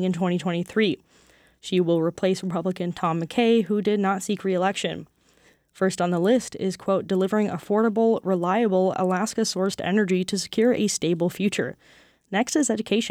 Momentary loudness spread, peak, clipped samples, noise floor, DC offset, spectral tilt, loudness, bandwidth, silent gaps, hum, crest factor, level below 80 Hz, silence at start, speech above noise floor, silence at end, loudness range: 6 LU; -10 dBFS; under 0.1%; -60 dBFS; under 0.1%; -5 dB/octave; -24 LUFS; 15.5 kHz; none; none; 14 dB; -64 dBFS; 0 s; 37 dB; 0 s; 2 LU